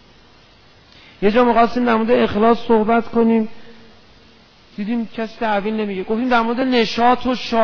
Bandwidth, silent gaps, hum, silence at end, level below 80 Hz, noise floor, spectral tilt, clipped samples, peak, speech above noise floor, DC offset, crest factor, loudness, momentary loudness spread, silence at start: 5.4 kHz; none; none; 0 s; -46 dBFS; -49 dBFS; -6.5 dB/octave; under 0.1%; -2 dBFS; 32 dB; under 0.1%; 16 dB; -17 LUFS; 9 LU; 1.2 s